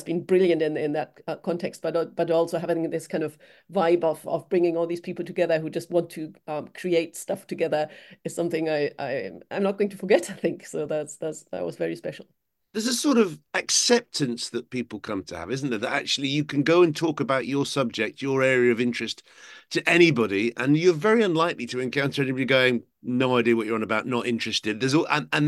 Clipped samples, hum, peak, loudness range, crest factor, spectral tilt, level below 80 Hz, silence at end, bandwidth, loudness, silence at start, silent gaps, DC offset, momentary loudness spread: under 0.1%; none; -4 dBFS; 6 LU; 22 dB; -4.5 dB/octave; -70 dBFS; 0 s; 12.5 kHz; -25 LUFS; 0 s; none; under 0.1%; 12 LU